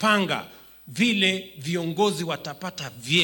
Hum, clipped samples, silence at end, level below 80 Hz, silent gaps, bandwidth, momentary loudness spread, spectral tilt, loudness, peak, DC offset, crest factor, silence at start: none; under 0.1%; 0 s; -64 dBFS; none; 17.5 kHz; 13 LU; -4 dB/octave; -25 LUFS; -8 dBFS; under 0.1%; 18 dB; 0 s